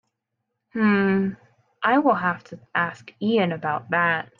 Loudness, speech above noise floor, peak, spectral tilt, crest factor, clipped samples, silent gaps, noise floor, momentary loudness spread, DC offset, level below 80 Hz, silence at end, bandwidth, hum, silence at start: -23 LUFS; 57 dB; -6 dBFS; -8 dB/octave; 16 dB; under 0.1%; none; -80 dBFS; 10 LU; under 0.1%; -68 dBFS; 0.15 s; 7.2 kHz; none; 0.75 s